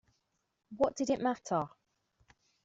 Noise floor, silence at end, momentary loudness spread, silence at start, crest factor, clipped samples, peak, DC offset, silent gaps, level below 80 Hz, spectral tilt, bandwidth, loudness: -82 dBFS; 0.95 s; 11 LU; 0.7 s; 20 dB; under 0.1%; -16 dBFS; under 0.1%; none; -70 dBFS; -5.5 dB/octave; 8 kHz; -34 LUFS